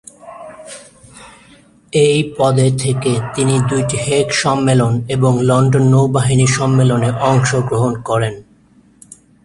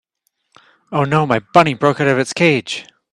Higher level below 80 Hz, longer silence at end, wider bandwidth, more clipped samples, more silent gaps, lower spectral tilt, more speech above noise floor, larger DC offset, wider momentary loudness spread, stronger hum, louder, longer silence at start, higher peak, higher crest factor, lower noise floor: first, -44 dBFS vs -56 dBFS; first, 1.05 s vs 0.3 s; about the same, 11.5 kHz vs 11.5 kHz; neither; neither; about the same, -5.5 dB/octave vs -5.5 dB/octave; second, 36 dB vs 54 dB; neither; first, 16 LU vs 10 LU; neither; about the same, -14 LUFS vs -15 LUFS; second, 0.25 s vs 0.9 s; about the same, 0 dBFS vs 0 dBFS; about the same, 14 dB vs 16 dB; second, -49 dBFS vs -69 dBFS